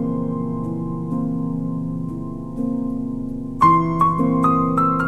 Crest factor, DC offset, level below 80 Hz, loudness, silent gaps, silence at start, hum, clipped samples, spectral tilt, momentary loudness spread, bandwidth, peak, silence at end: 18 dB; under 0.1%; -40 dBFS; -21 LUFS; none; 0 s; none; under 0.1%; -9.5 dB/octave; 12 LU; 9.2 kHz; -4 dBFS; 0 s